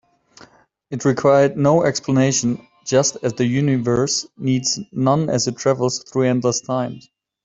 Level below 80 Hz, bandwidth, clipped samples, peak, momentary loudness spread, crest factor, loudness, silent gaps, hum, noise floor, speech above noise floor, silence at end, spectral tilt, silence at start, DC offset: -54 dBFS; 8 kHz; under 0.1%; -2 dBFS; 8 LU; 16 dB; -19 LUFS; none; none; -51 dBFS; 32 dB; 0.45 s; -5 dB/octave; 0.9 s; under 0.1%